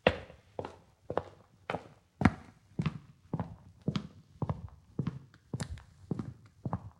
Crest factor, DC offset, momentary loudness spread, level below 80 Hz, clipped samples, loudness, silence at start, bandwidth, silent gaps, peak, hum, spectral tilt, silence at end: 32 dB; under 0.1%; 18 LU; -54 dBFS; under 0.1%; -38 LUFS; 0.05 s; 11.5 kHz; none; -4 dBFS; none; -7 dB/octave; 0.05 s